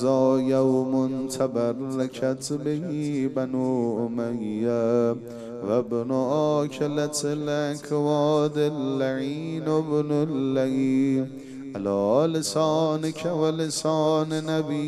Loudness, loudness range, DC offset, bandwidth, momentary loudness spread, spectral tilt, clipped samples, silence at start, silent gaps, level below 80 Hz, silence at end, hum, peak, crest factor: -25 LUFS; 2 LU; under 0.1%; 14 kHz; 6 LU; -6 dB/octave; under 0.1%; 0 s; none; -68 dBFS; 0 s; none; -8 dBFS; 16 dB